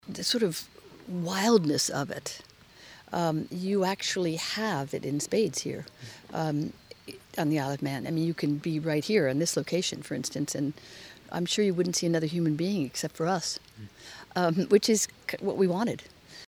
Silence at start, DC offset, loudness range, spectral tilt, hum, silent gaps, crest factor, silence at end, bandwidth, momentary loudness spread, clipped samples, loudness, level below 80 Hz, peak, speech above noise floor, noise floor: 0.05 s; under 0.1%; 3 LU; -4.5 dB/octave; none; none; 20 dB; 0.05 s; over 20 kHz; 19 LU; under 0.1%; -29 LUFS; -66 dBFS; -8 dBFS; 24 dB; -52 dBFS